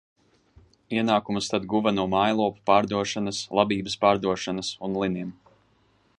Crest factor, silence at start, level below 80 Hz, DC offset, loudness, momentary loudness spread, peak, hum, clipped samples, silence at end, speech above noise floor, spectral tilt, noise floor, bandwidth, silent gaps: 22 dB; 0.9 s; -58 dBFS; under 0.1%; -25 LUFS; 8 LU; -4 dBFS; none; under 0.1%; 0.85 s; 40 dB; -5 dB/octave; -64 dBFS; 11 kHz; none